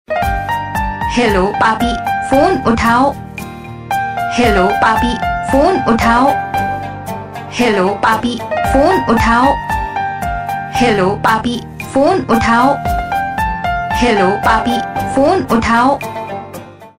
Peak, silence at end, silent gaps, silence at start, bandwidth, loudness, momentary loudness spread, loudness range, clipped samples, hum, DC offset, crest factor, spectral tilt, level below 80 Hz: 0 dBFS; 0.1 s; none; 0.1 s; 16 kHz; -14 LUFS; 11 LU; 1 LU; under 0.1%; none; under 0.1%; 14 dB; -5.5 dB/octave; -30 dBFS